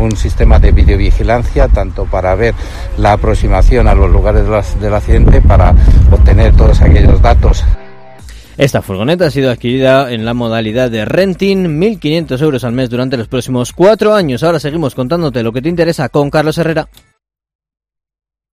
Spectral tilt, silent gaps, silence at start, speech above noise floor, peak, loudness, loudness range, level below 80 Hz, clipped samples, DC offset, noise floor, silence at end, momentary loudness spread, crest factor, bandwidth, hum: -7 dB/octave; none; 0 s; 25 dB; 0 dBFS; -11 LUFS; 5 LU; -12 dBFS; 2%; under 0.1%; -33 dBFS; 1.7 s; 8 LU; 8 dB; 14 kHz; none